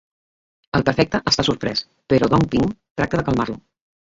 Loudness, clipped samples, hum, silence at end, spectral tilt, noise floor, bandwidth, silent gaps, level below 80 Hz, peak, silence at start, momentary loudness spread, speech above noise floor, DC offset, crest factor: -20 LUFS; under 0.1%; none; 0.55 s; -5.5 dB/octave; under -90 dBFS; 8 kHz; 2.90-2.95 s; -42 dBFS; -2 dBFS; 0.75 s; 8 LU; over 71 dB; under 0.1%; 20 dB